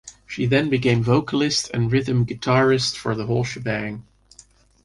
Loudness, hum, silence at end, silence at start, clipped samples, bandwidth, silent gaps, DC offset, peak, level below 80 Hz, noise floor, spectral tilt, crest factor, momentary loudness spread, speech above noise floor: -21 LUFS; none; 0.85 s; 0.05 s; under 0.1%; 11.5 kHz; none; under 0.1%; -6 dBFS; -50 dBFS; -52 dBFS; -5.5 dB/octave; 16 dB; 8 LU; 32 dB